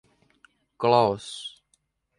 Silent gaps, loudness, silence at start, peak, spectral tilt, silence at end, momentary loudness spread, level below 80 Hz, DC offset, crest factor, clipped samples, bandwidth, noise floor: none; -24 LUFS; 0.8 s; -4 dBFS; -5.5 dB/octave; 0.7 s; 17 LU; -64 dBFS; under 0.1%; 22 dB; under 0.1%; 11 kHz; -71 dBFS